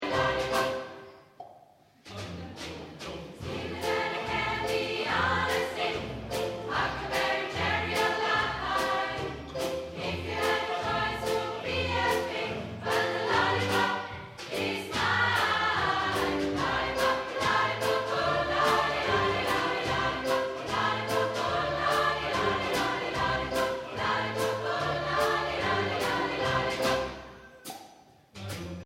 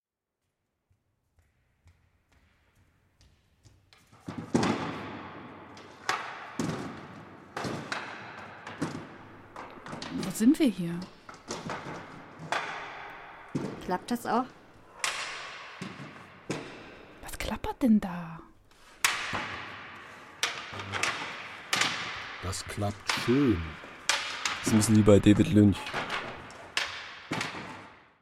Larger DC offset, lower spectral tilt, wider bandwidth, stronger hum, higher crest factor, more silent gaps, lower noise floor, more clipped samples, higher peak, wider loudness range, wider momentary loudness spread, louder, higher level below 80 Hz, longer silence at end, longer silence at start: neither; about the same, -4 dB/octave vs -4.5 dB/octave; about the same, 16 kHz vs 16 kHz; neither; second, 18 dB vs 26 dB; neither; second, -58 dBFS vs -85 dBFS; neither; second, -12 dBFS vs -6 dBFS; second, 4 LU vs 12 LU; second, 12 LU vs 21 LU; about the same, -29 LUFS vs -30 LUFS; about the same, -52 dBFS vs -54 dBFS; second, 0 s vs 0.25 s; second, 0 s vs 4.15 s